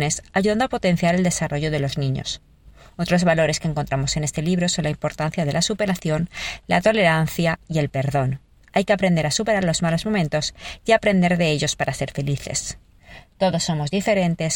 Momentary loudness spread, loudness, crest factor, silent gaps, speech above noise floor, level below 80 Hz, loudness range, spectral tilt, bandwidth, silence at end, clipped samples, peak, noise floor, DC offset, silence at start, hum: 8 LU; -21 LUFS; 18 dB; none; 25 dB; -44 dBFS; 2 LU; -5 dB/octave; 17 kHz; 0 s; under 0.1%; -2 dBFS; -46 dBFS; 0.2%; 0 s; none